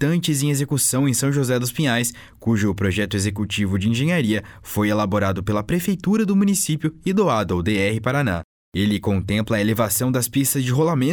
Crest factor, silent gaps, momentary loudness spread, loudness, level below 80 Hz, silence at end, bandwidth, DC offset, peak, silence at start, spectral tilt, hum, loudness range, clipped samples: 12 dB; 8.44-8.72 s; 4 LU; -21 LUFS; -46 dBFS; 0 s; over 20 kHz; under 0.1%; -8 dBFS; 0 s; -5 dB/octave; none; 1 LU; under 0.1%